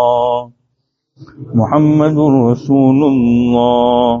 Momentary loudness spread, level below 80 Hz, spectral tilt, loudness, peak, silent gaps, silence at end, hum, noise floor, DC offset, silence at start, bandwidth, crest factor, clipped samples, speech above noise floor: 6 LU; -44 dBFS; -7.5 dB/octave; -12 LUFS; 0 dBFS; none; 0 s; none; -68 dBFS; under 0.1%; 0 s; 7 kHz; 12 dB; under 0.1%; 58 dB